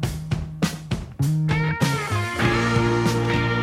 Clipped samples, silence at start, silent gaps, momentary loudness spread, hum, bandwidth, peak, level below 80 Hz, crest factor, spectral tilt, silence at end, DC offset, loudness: under 0.1%; 0 s; none; 8 LU; none; 15.5 kHz; -8 dBFS; -38 dBFS; 14 dB; -6 dB/octave; 0 s; under 0.1%; -23 LUFS